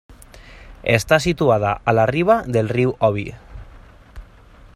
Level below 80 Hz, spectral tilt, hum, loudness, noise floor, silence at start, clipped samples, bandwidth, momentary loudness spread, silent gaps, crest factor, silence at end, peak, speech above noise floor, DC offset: -42 dBFS; -6 dB/octave; none; -18 LUFS; -45 dBFS; 0.1 s; under 0.1%; 15 kHz; 6 LU; none; 18 dB; 0.5 s; -2 dBFS; 28 dB; under 0.1%